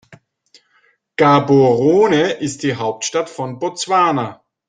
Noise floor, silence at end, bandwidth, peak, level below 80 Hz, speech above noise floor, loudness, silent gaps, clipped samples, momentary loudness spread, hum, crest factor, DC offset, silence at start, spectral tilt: -59 dBFS; 0.35 s; 9.8 kHz; -2 dBFS; -58 dBFS; 44 dB; -16 LUFS; none; under 0.1%; 12 LU; none; 16 dB; under 0.1%; 0.1 s; -5 dB/octave